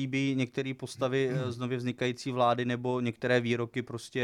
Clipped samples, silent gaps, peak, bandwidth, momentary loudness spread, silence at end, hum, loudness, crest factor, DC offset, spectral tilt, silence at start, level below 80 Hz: under 0.1%; none; -12 dBFS; 12.5 kHz; 8 LU; 0 s; none; -31 LUFS; 18 dB; under 0.1%; -6 dB/octave; 0 s; -72 dBFS